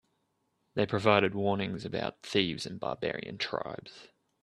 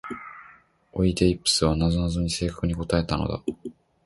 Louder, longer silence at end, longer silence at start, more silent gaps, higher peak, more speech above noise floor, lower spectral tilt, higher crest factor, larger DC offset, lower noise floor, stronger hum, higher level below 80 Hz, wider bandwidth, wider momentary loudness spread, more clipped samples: second, -31 LUFS vs -24 LUFS; about the same, 0.35 s vs 0.35 s; first, 0.75 s vs 0.05 s; neither; about the same, -8 dBFS vs -6 dBFS; first, 46 dB vs 30 dB; about the same, -5.5 dB/octave vs -5 dB/octave; first, 26 dB vs 20 dB; neither; first, -77 dBFS vs -54 dBFS; neither; second, -66 dBFS vs -38 dBFS; about the same, 12 kHz vs 11.5 kHz; second, 13 LU vs 17 LU; neither